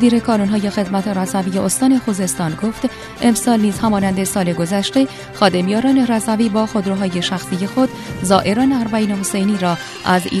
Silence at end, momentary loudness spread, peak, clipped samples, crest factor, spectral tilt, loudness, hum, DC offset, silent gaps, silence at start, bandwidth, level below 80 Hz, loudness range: 0 s; 6 LU; 0 dBFS; under 0.1%; 16 dB; -5 dB/octave; -17 LUFS; none; under 0.1%; none; 0 s; 14 kHz; -46 dBFS; 1 LU